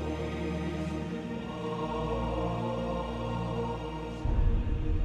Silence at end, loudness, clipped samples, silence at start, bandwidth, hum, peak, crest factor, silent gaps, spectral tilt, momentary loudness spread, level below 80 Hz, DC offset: 0 s; -34 LUFS; under 0.1%; 0 s; 10 kHz; none; -16 dBFS; 14 dB; none; -7.5 dB/octave; 5 LU; -36 dBFS; under 0.1%